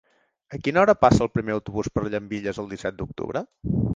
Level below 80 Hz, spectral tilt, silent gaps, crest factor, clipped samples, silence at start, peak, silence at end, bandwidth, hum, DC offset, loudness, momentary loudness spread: -42 dBFS; -7 dB/octave; none; 22 dB; under 0.1%; 0.5 s; -2 dBFS; 0 s; 9.6 kHz; none; under 0.1%; -24 LUFS; 13 LU